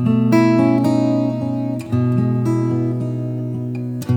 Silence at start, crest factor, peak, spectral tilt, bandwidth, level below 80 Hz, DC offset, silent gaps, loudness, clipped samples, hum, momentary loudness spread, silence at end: 0 s; 14 dB; -2 dBFS; -8.5 dB/octave; 16.5 kHz; -56 dBFS; under 0.1%; none; -18 LUFS; under 0.1%; none; 10 LU; 0 s